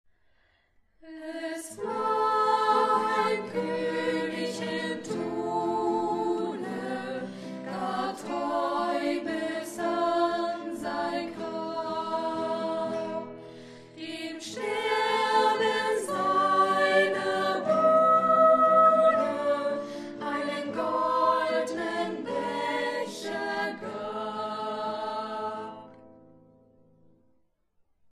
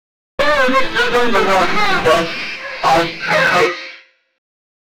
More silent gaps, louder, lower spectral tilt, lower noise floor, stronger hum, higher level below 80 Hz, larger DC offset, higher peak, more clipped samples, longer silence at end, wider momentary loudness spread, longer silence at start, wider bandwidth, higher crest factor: neither; second, -27 LUFS vs -14 LUFS; about the same, -4.5 dB/octave vs -3.5 dB/octave; first, -69 dBFS vs -41 dBFS; neither; second, -72 dBFS vs -40 dBFS; neither; second, -10 dBFS vs -2 dBFS; neither; first, 2.05 s vs 0.6 s; first, 14 LU vs 10 LU; first, 1.05 s vs 0.4 s; second, 13 kHz vs 20 kHz; about the same, 18 dB vs 14 dB